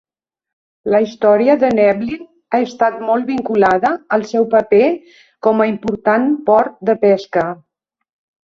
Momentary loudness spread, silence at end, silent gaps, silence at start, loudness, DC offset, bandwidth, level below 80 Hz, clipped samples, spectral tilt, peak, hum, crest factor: 8 LU; 0.9 s; none; 0.85 s; -15 LUFS; under 0.1%; 7.2 kHz; -56 dBFS; under 0.1%; -7 dB/octave; -2 dBFS; none; 14 dB